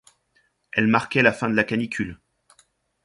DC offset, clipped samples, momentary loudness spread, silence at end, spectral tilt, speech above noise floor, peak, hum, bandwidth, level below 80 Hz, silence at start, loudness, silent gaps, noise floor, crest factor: under 0.1%; under 0.1%; 10 LU; 0.9 s; -6 dB/octave; 45 dB; -2 dBFS; none; 11.5 kHz; -56 dBFS; 0.75 s; -22 LUFS; none; -67 dBFS; 22 dB